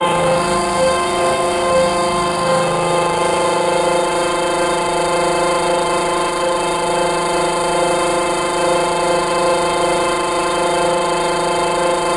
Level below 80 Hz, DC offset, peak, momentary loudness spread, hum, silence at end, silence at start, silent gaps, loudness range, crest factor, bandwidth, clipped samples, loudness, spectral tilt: -42 dBFS; under 0.1%; -4 dBFS; 1 LU; none; 0 s; 0 s; none; 1 LU; 12 dB; 11.5 kHz; under 0.1%; -16 LUFS; -3.5 dB/octave